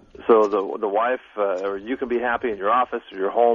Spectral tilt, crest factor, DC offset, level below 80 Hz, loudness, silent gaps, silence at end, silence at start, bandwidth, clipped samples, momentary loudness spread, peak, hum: -6 dB/octave; 18 dB; under 0.1%; -58 dBFS; -22 LUFS; none; 0 s; 0.2 s; 7.4 kHz; under 0.1%; 9 LU; -4 dBFS; none